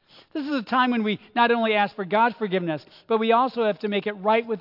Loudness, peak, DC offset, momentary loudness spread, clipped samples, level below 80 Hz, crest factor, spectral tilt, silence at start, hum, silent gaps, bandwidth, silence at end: -23 LUFS; -6 dBFS; under 0.1%; 8 LU; under 0.1%; -76 dBFS; 16 dB; -7.5 dB/octave; 0.35 s; none; none; 5.8 kHz; 0 s